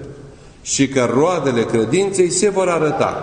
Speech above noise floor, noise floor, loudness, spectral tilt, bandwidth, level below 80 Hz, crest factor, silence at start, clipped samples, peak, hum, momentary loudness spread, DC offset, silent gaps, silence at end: 23 dB; -39 dBFS; -16 LUFS; -4.5 dB/octave; 10.5 kHz; -48 dBFS; 14 dB; 0 s; under 0.1%; -2 dBFS; none; 4 LU; under 0.1%; none; 0 s